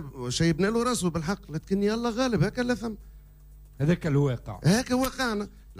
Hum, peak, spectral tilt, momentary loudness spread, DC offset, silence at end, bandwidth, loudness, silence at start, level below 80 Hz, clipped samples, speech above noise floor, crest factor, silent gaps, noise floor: none; -12 dBFS; -5.5 dB/octave; 7 LU; under 0.1%; 0 s; 15.5 kHz; -27 LUFS; 0 s; -46 dBFS; under 0.1%; 23 dB; 14 dB; none; -49 dBFS